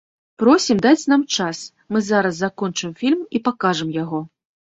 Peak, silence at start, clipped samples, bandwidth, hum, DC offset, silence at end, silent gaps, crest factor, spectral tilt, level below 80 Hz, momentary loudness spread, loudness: -2 dBFS; 0.4 s; under 0.1%; 8 kHz; none; under 0.1%; 0.45 s; none; 18 dB; -4.5 dB/octave; -60 dBFS; 11 LU; -19 LUFS